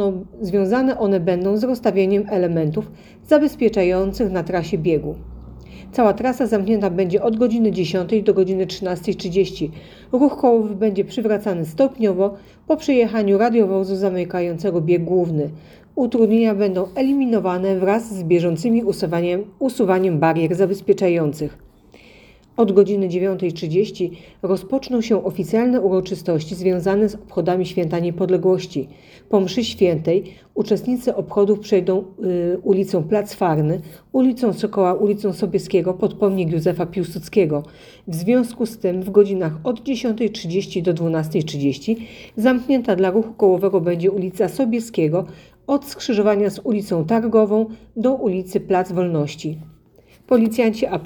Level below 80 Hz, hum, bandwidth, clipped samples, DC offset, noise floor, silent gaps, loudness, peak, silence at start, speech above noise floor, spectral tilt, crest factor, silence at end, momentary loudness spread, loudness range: -50 dBFS; none; 19.5 kHz; under 0.1%; under 0.1%; -51 dBFS; none; -19 LUFS; 0 dBFS; 0 s; 33 dB; -7 dB/octave; 18 dB; 0 s; 7 LU; 2 LU